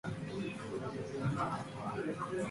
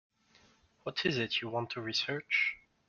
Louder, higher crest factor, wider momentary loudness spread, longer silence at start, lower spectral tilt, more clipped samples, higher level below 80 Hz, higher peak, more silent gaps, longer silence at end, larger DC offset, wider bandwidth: second, -39 LUFS vs -33 LUFS; about the same, 16 dB vs 20 dB; about the same, 5 LU vs 7 LU; second, 0.05 s vs 0.85 s; first, -6.5 dB/octave vs -4 dB/octave; neither; first, -64 dBFS vs -72 dBFS; second, -22 dBFS vs -16 dBFS; neither; second, 0 s vs 0.3 s; neither; first, 11.5 kHz vs 7.2 kHz